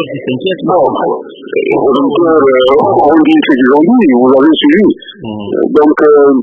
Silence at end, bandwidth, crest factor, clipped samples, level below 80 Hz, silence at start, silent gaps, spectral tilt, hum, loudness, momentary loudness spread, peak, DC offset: 0 s; 4.5 kHz; 8 dB; 0.3%; -48 dBFS; 0 s; none; -8 dB/octave; none; -8 LUFS; 10 LU; 0 dBFS; under 0.1%